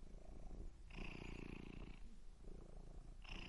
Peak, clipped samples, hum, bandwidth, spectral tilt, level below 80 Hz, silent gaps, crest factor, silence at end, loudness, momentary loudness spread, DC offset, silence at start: -38 dBFS; under 0.1%; none; 11 kHz; -5.5 dB/octave; -56 dBFS; none; 14 dB; 0 s; -58 LUFS; 9 LU; under 0.1%; 0 s